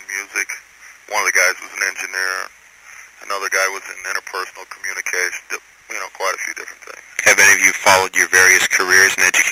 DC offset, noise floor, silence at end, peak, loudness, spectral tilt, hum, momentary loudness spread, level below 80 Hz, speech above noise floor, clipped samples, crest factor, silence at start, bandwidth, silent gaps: under 0.1%; -43 dBFS; 0 s; 0 dBFS; -15 LUFS; 0.5 dB/octave; none; 19 LU; -62 dBFS; 27 dB; under 0.1%; 18 dB; 0 s; 16 kHz; none